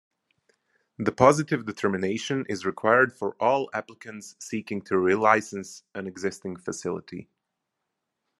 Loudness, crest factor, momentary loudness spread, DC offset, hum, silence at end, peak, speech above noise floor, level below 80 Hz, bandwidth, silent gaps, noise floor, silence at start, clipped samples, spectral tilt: -25 LUFS; 26 dB; 18 LU; under 0.1%; none; 1.15 s; -2 dBFS; 57 dB; -66 dBFS; 12.5 kHz; none; -82 dBFS; 1 s; under 0.1%; -5 dB/octave